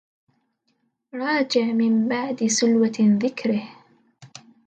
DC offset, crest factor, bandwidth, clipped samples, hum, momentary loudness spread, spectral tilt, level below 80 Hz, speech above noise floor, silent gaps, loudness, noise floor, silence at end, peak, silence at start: under 0.1%; 14 dB; 9 kHz; under 0.1%; none; 10 LU; -4.5 dB/octave; -72 dBFS; 50 dB; none; -21 LUFS; -71 dBFS; 0.3 s; -8 dBFS; 1.15 s